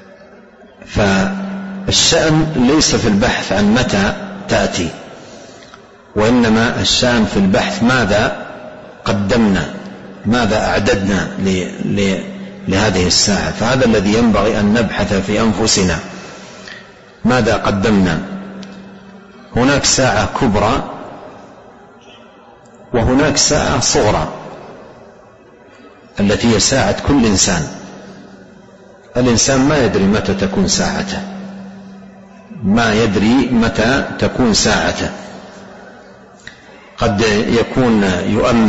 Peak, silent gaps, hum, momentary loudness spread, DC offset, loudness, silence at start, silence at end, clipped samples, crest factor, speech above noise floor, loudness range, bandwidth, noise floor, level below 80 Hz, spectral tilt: 0 dBFS; none; none; 20 LU; under 0.1%; -14 LUFS; 0.2 s; 0 s; under 0.1%; 16 dB; 29 dB; 4 LU; 8.2 kHz; -42 dBFS; -32 dBFS; -4 dB/octave